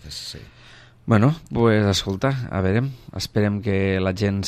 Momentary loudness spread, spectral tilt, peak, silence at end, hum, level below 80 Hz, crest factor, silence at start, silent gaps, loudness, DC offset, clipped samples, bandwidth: 14 LU; -6 dB/octave; -4 dBFS; 0 s; none; -46 dBFS; 18 dB; 0.05 s; none; -21 LUFS; under 0.1%; under 0.1%; 14 kHz